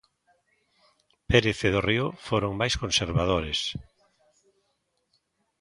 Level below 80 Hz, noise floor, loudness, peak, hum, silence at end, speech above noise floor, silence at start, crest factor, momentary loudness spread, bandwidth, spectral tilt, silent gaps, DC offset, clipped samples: -44 dBFS; -75 dBFS; -25 LUFS; -4 dBFS; none; 1.8 s; 49 dB; 1.3 s; 24 dB; 6 LU; 11.5 kHz; -4.5 dB/octave; none; under 0.1%; under 0.1%